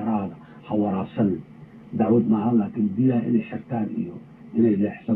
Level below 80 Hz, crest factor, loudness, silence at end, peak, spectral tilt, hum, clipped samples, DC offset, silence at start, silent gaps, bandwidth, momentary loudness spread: -62 dBFS; 14 dB; -23 LUFS; 0 s; -10 dBFS; -12 dB/octave; none; under 0.1%; under 0.1%; 0 s; none; 3.9 kHz; 13 LU